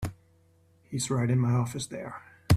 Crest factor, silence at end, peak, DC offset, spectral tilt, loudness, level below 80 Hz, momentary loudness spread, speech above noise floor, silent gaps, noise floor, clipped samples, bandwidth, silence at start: 22 dB; 0 s; -8 dBFS; under 0.1%; -6 dB/octave; -29 LUFS; -48 dBFS; 15 LU; 35 dB; none; -63 dBFS; under 0.1%; 14.5 kHz; 0 s